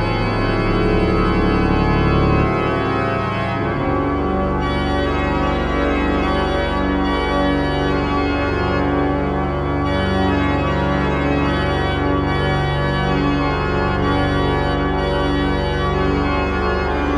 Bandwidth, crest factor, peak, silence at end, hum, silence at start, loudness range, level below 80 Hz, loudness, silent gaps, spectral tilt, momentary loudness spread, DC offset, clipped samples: 9.6 kHz; 14 dB; -4 dBFS; 0 s; none; 0 s; 1 LU; -26 dBFS; -18 LUFS; none; -7.5 dB/octave; 3 LU; under 0.1%; under 0.1%